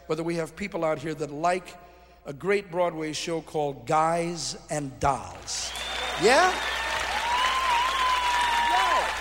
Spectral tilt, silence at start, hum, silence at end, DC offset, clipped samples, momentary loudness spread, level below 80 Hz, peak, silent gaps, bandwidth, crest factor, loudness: -3 dB/octave; 0.05 s; none; 0 s; under 0.1%; under 0.1%; 10 LU; -50 dBFS; -8 dBFS; none; 16 kHz; 20 dB; -26 LUFS